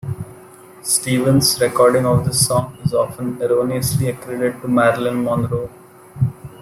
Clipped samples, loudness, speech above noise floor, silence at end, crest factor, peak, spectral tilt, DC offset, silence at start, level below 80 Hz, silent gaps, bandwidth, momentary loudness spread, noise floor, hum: under 0.1%; -17 LUFS; 25 dB; 0 s; 18 dB; 0 dBFS; -4.5 dB/octave; under 0.1%; 0.05 s; -46 dBFS; none; 16 kHz; 10 LU; -42 dBFS; none